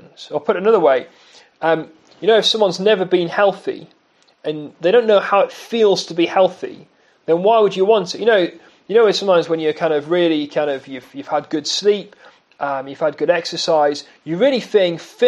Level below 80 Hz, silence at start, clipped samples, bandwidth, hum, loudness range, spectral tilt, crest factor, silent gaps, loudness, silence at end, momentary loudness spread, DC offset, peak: -74 dBFS; 0.2 s; under 0.1%; 11.5 kHz; none; 4 LU; -4.5 dB/octave; 16 dB; none; -17 LUFS; 0 s; 13 LU; under 0.1%; -2 dBFS